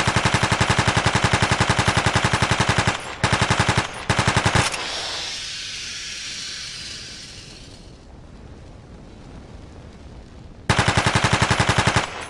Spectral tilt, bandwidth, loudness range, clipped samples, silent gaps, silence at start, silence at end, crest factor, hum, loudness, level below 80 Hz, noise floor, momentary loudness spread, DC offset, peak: -3.5 dB/octave; 14.5 kHz; 19 LU; under 0.1%; none; 0 s; 0 s; 14 dB; none; -20 LUFS; -38 dBFS; -42 dBFS; 18 LU; under 0.1%; -8 dBFS